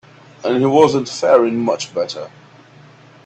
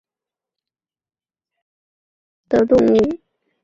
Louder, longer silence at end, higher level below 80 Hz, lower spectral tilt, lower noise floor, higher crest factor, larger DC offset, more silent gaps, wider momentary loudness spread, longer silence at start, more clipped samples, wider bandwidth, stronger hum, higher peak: about the same, -16 LUFS vs -16 LUFS; first, 0.95 s vs 0.45 s; second, -60 dBFS vs -50 dBFS; second, -5.5 dB/octave vs -7.5 dB/octave; second, -44 dBFS vs under -90 dBFS; about the same, 18 dB vs 18 dB; neither; neither; first, 13 LU vs 10 LU; second, 0.45 s vs 2.5 s; neither; first, 8.8 kHz vs 7.6 kHz; neither; first, 0 dBFS vs -4 dBFS